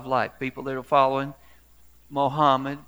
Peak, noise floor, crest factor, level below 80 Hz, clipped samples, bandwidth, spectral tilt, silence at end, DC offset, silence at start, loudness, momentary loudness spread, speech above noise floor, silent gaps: -4 dBFS; -56 dBFS; 20 dB; -60 dBFS; under 0.1%; over 20 kHz; -6.5 dB/octave; 0.05 s; 0.2%; 0 s; -24 LUFS; 12 LU; 32 dB; none